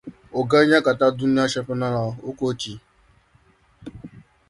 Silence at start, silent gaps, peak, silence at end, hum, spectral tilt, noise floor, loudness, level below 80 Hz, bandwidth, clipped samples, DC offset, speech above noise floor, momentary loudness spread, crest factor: 0.05 s; none; -4 dBFS; 0.3 s; none; -5.5 dB/octave; -58 dBFS; -21 LUFS; -56 dBFS; 11.5 kHz; under 0.1%; under 0.1%; 38 dB; 24 LU; 20 dB